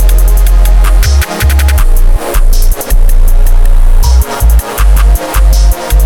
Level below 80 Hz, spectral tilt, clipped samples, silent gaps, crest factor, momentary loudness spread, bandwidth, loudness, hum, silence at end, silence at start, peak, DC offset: -4 dBFS; -4.5 dB/octave; 2%; none; 4 dB; 4 LU; 18 kHz; -10 LUFS; none; 0 s; 0 s; 0 dBFS; under 0.1%